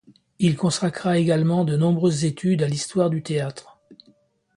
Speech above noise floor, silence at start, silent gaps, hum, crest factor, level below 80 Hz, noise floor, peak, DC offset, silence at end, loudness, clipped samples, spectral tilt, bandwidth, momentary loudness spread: 39 dB; 0.4 s; none; none; 16 dB; -60 dBFS; -60 dBFS; -6 dBFS; under 0.1%; 0.65 s; -22 LUFS; under 0.1%; -6 dB/octave; 11 kHz; 6 LU